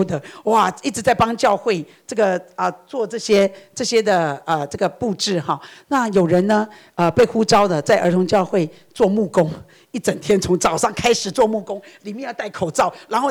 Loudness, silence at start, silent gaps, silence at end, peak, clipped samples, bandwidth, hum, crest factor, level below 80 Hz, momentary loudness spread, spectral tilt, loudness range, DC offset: -19 LUFS; 0 s; none; 0 s; -6 dBFS; under 0.1%; 19.5 kHz; none; 12 dB; -50 dBFS; 10 LU; -4.5 dB/octave; 3 LU; under 0.1%